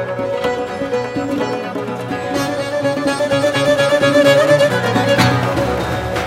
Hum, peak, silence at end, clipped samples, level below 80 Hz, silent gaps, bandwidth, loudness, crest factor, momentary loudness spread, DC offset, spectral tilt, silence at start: none; 0 dBFS; 0 s; under 0.1%; -40 dBFS; none; 16 kHz; -16 LUFS; 16 dB; 10 LU; under 0.1%; -5 dB/octave; 0 s